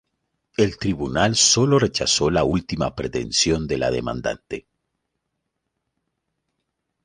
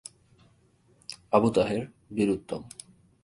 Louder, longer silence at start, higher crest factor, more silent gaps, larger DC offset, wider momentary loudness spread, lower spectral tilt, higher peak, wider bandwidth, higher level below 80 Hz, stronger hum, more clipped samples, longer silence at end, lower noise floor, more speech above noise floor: first, -20 LUFS vs -27 LUFS; second, 0.6 s vs 1.1 s; about the same, 20 dB vs 24 dB; neither; neither; second, 13 LU vs 22 LU; second, -3.5 dB/octave vs -6 dB/octave; about the same, -4 dBFS vs -6 dBFS; about the same, 11 kHz vs 11.5 kHz; first, -42 dBFS vs -60 dBFS; neither; neither; first, 2.45 s vs 0.55 s; first, -78 dBFS vs -63 dBFS; first, 57 dB vs 37 dB